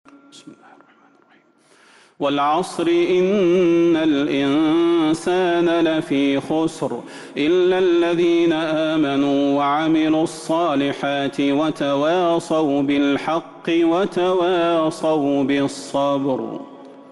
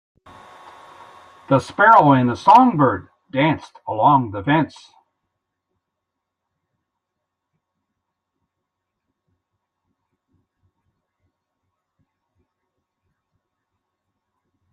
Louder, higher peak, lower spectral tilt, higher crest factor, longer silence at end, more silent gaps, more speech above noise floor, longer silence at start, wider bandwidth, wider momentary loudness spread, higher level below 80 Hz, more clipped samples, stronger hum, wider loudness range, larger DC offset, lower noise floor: second, -19 LUFS vs -16 LUFS; second, -10 dBFS vs -2 dBFS; second, -5.5 dB/octave vs -7.5 dB/octave; second, 8 dB vs 20 dB; second, 0.1 s vs 10.05 s; neither; second, 37 dB vs 65 dB; second, 0.35 s vs 1.5 s; about the same, 11.5 kHz vs 10.5 kHz; second, 6 LU vs 16 LU; first, -58 dBFS vs -64 dBFS; neither; neither; second, 2 LU vs 11 LU; neither; second, -55 dBFS vs -81 dBFS